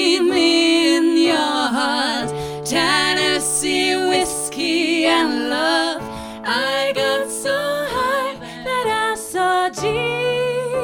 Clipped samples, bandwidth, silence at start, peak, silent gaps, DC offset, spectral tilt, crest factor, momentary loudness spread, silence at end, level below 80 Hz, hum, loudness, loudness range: under 0.1%; 17.5 kHz; 0 s; -4 dBFS; none; under 0.1%; -2.5 dB/octave; 14 dB; 7 LU; 0 s; -50 dBFS; none; -18 LUFS; 4 LU